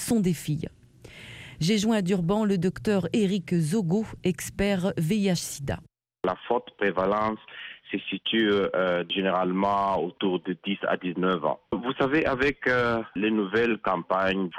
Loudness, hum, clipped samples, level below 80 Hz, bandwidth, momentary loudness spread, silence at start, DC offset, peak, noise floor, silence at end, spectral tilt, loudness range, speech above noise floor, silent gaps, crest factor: -26 LUFS; none; under 0.1%; -52 dBFS; 16 kHz; 8 LU; 0 s; under 0.1%; -10 dBFS; -47 dBFS; 0 s; -5.5 dB/octave; 2 LU; 22 dB; none; 16 dB